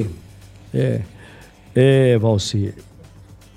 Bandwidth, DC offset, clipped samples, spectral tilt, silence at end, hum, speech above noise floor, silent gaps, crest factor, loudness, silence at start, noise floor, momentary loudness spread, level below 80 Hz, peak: 11.5 kHz; under 0.1%; under 0.1%; -6.5 dB/octave; 0.75 s; none; 27 dB; none; 16 dB; -18 LUFS; 0 s; -44 dBFS; 14 LU; -48 dBFS; -2 dBFS